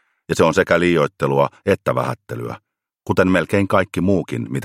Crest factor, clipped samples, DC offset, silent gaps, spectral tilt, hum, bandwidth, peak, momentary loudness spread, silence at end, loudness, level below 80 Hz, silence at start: 18 dB; under 0.1%; under 0.1%; none; -6.5 dB/octave; none; 16 kHz; 0 dBFS; 13 LU; 0 s; -18 LUFS; -50 dBFS; 0.3 s